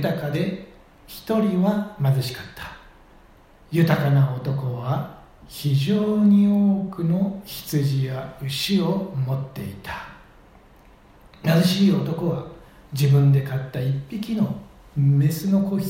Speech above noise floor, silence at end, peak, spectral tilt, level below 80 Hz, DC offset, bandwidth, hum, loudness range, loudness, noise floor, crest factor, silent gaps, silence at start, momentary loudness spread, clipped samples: 30 dB; 0 s; -6 dBFS; -7 dB/octave; -52 dBFS; under 0.1%; 16.5 kHz; none; 5 LU; -22 LUFS; -51 dBFS; 16 dB; none; 0 s; 16 LU; under 0.1%